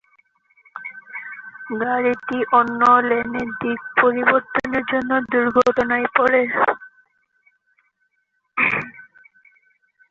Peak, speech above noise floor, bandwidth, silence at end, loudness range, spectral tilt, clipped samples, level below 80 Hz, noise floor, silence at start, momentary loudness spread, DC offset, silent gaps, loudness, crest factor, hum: -2 dBFS; 52 dB; 7.4 kHz; 1.1 s; 6 LU; -6 dB/octave; under 0.1%; -58 dBFS; -70 dBFS; 0.75 s; 18 LU; under 0.1%; none; -18 LUFS; 18 dB; none